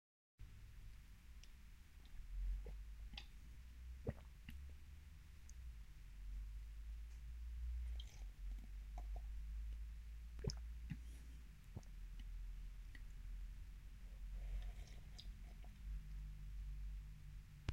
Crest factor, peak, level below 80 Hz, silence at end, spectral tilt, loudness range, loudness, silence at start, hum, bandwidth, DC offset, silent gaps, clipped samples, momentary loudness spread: 24 dB; -28 dBFS; -52 dBFS; 0 s; -5.5 dB/octave; 4 LU; -55 LUFS; 0.35 s; none; 15.5 kHz; under 0.1%; none; under 0.1%; 11 LU